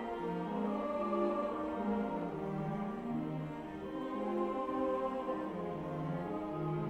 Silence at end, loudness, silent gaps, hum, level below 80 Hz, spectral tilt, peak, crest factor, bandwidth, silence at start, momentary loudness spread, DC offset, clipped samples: 0 s; -38 LUFS; none; none; -62 dBFS; -8.5 dB/octave; -22 dBFS; 14 dB; 10.5 kHz; 0 s; 5 LU; under 0.1%; under 0.1%